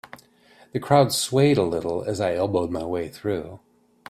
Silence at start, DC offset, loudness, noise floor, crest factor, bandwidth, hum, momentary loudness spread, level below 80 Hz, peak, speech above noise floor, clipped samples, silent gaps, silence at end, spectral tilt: 0.75 s; under 0.1%; -23 LUFS; -55 dBFS; 22 dB; 16 kHz; none; 12 LU; -56 dBFS; -2 dBFS; 33 dB; under 0.1%; none; 0.5 s; -5.5 dB/octave